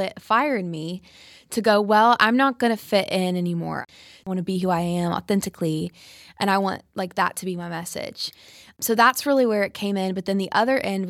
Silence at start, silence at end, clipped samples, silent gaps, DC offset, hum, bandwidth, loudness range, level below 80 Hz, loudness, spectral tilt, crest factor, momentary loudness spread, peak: 0 s; 0 s; under 0.1%; none; under 0.1%; none; 17 kHz; 5 LU; -62 dBFS; -22 LUFS; -5 dB/octave; 20 dB; 13 LU; -2 dBFS